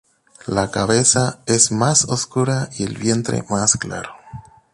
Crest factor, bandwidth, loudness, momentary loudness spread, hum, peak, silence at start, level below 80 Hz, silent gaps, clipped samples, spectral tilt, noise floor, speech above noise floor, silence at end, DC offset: 20 dB; 11.5 kHz; -17 LUFS; 14 LU; none; 0 dBFS; 0.45 s; -48 dBFS; none; under 0.1%; -3.5 dB/octave; -39 dBFS; 20 dB; 0.35 s; under 0.1%